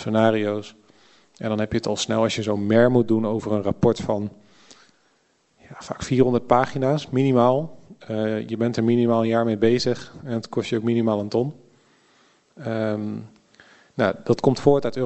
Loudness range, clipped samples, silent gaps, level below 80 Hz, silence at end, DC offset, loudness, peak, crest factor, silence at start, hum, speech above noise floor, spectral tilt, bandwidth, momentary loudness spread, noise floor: 5 LU; under 0.1%; none; -54 dBFS; 0 s; under 0.1%; -22 LUFS; -2 dBFS; 22 dB; 0 s; none; 43 dB; -6.5 dB/octave; 8.4 kHz; 13 LU; -64 dBFS